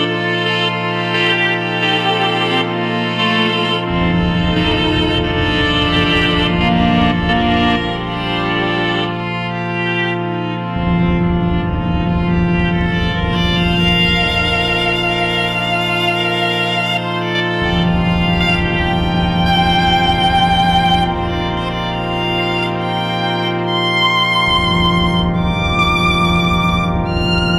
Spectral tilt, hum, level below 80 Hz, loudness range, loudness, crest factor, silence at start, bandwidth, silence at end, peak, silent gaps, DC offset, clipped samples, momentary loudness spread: -6 dB/octave; none; -28 dBFS; 3 LU; -15 LUFS; 12 dB; 0 s; 12 kHz; 0 s; -4 dBFS; none; under 0.1%; under 0.1%; 6 LU